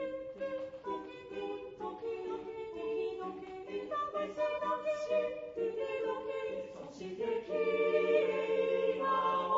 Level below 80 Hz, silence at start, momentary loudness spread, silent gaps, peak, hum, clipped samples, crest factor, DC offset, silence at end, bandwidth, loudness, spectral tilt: -72 dBFS; 0 s; 12 LU; none; -18 dBFS; none; under 0.1%; 18 dB; under 0.1%; 0 s; 7.6 kHz; -36 LUFS; -3 dB/octave